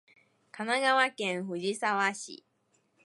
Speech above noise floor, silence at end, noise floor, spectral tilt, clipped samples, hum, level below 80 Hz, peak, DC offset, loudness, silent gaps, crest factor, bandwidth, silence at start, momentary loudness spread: 43 dB; 0.7 s; -73 dBFS; -3 dB/octave; under 0.1%; none; -86 dBFS; -12 dBFS; under 0.1%; -29 LUFS; none; 20 dB; 11.5 kHz; 0.55 s; 16 LU